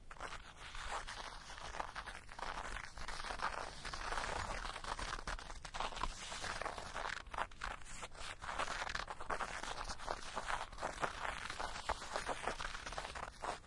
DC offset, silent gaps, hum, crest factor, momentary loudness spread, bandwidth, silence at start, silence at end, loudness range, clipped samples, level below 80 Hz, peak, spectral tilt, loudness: under 0.1%; none; none; 24 dB; 7 LU; 11.5 kHz; 0 s; 0 s; 3 LU; under 0.1%; -52 dBFS; -20 dBFS; -2.5 dB/octave; -44 LUFS